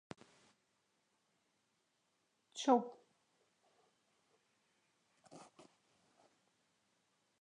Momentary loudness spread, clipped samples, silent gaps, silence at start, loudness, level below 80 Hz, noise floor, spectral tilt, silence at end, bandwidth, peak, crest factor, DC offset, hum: 26 LU; under 0.1%; none; 2.55 s; -35 LUFS; under -90 dBFS; -82 dBFS; -4 dB/octave; 2 s; 10.5 kHz; -18 dBFS; 30 dB; under 0.1%; none